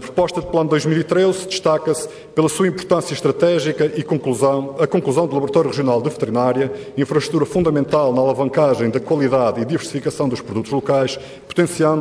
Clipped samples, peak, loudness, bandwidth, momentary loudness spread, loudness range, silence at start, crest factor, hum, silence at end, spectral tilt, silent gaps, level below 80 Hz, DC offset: under 0.1%; -4 dBFS; -18 LUFS; 11 kHz; 6 LU; 1 LU; 0 s; 14 dB; none; 0 s; -6 dB/octave; none; -52 dBFS; under 0.1%